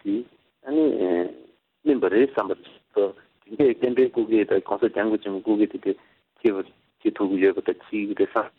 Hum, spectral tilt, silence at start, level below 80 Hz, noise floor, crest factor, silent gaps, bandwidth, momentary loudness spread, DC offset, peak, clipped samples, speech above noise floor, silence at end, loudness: none; -9 dB/octave; 0.05 s; -66 dBFS; -52 dBFS; 16 dB; none; 4.2 kHz; 10 LU; under 0.1%; -6 dBFS; under 0.1%; 30 dB; 0.1 s; -24 LUFS